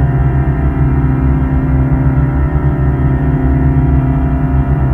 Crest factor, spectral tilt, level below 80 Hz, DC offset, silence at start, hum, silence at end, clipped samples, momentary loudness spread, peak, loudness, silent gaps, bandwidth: 10 dB; -11.5 dB/octave; -16 dBFS; under 0.1%; 0 s; none; 0 s; under 0.1%; 2 LU; 0 dBFS; -13 LUFS; none; 3.4 kHz